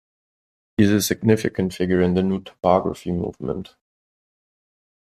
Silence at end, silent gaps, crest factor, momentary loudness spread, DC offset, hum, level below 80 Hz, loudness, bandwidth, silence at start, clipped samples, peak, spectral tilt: 1.4 s; none; 20 dB; 11 LU; under 0.1%; none; -52 dBFS; -21 LUFS; 14.5 kHz; 0.8 s; under 0.1%; -2 dBFS; -6 dB/octave